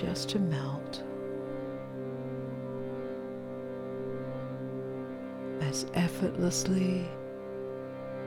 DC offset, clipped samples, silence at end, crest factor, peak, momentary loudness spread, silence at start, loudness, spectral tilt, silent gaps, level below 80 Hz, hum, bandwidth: under 0.1%; under 0.1%; 0 s; 18 dB; -16 dBFS; 10 LU; 0 s; -35 LUFS; -5.5 dB/octave; none; -60 dBFS; none; 17.5 kHz